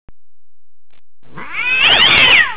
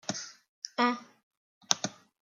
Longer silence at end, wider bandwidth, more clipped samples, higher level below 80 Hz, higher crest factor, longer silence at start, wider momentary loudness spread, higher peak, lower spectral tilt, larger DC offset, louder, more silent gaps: second, 0 s vs 0.35 s; second, 4 kHz vs 16 kHz; neither; first, -42 dBFS vs -84 dBFS; second, 14 dB vs 36 dB; first, 1.35 s vs 0.1 s; about the same, 14 LU vs 13 LU; about the same, 0 dBFS vs 0 dBFS; first, -5 dB/octave vs -2 dB/octave; first, 4% vs under 0.1%; first, -8 LUFS vs -32 LUFS; second, none vs 0.49-0.62 s, 1.23-1.31 s, 1.37-1.61 s